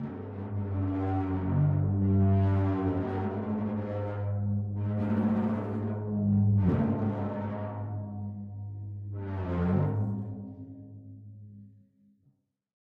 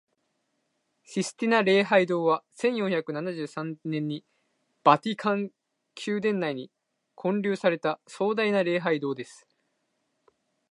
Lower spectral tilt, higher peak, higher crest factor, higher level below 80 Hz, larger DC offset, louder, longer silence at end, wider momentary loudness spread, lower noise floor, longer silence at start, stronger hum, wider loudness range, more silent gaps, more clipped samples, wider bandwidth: first, -11.5 dB/octave vs -5.5 dB/octave; second, -14 dBFS vs -4 dBFS; second, 16 dB vs 24 dB; first, -56 dBFS vs -80 dBFS; neither; second, -30 LUFS vs -27 LUFS; about the same, 1.25 s vs 1.35 s; first, 16 LU vs 13 LU; second, -71 dBFS vs -76 dBFS; second, 0 s vs 1.1 s; neither; first, 6 LU vs 3 LU; neither; neither; second, 3.9 kHz vs 11.5 kHz